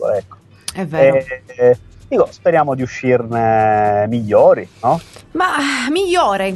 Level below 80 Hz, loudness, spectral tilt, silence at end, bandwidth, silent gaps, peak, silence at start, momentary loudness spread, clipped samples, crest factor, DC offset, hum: -48 dBFS; -15 LUFS; -5.5 dB/octave; 0 s; 12 kHz; none; 0 dBFS; 0 s; 9 LU; under 0.1%; 16 dB; under 0.1%; none